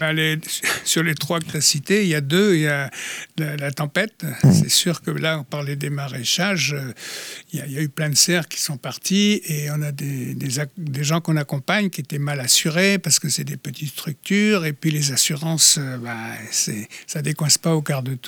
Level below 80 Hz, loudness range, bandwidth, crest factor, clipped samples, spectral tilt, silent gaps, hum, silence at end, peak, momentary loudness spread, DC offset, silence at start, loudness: -64 dBFS; 3 LU; 20 kHz; 18 dB; under 0.1%; -3.5 dB/octave; none; none; 0 s; -2 dBFS; 13 LU; under 0.1%; 0 s; -20 LUFS